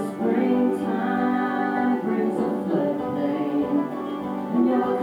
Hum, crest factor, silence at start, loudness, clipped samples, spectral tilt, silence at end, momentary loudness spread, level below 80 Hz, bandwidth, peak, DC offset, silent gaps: none; 12 dB; 0 s; -24 LUFS; under 0.1%; -8 dB/octave; 0 s; 4 LU; -64 dBFS; 12 kHz; -10 dBFS; under 0.1%; none